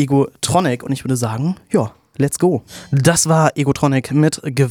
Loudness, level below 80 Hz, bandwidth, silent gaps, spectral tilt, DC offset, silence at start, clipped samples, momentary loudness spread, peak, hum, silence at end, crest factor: -17 LUFS; -48 dBFS; 19 kHz; none; -5.5 dB/octave; under 0.1%; 0 s; under 0.1%; 8 LU; 0 dBFS; none; 0 s; 16 dB